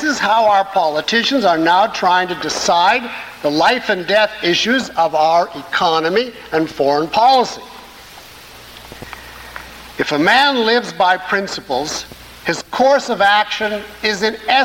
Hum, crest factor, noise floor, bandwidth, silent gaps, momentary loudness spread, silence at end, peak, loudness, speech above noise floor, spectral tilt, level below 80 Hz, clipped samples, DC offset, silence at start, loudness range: none; 14 dB; -38 dBFS; 17 kHz; none; 20 LU; 0 s; -2 dBFS; -15 LUFS; 23 dB; -3 dB/octave; -50 dBFS; under 0.1%; under 0.1%; 0 s; 4 LU